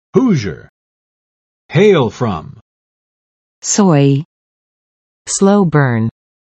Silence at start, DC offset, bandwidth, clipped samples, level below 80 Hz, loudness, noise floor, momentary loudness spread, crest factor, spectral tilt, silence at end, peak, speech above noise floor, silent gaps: 0.15 s; under 0.1%; 8.8 kHz; under 0.1%; -52 dBFS; -13 LUFS; under -90 dBFS; 15 LU; 16 dB; -5.5 dB/octave; 0.35 s; 0 dBFS; over 78 dB; 0.69-1.69 s, 2.61-3.62 s, 4.25-5.25 s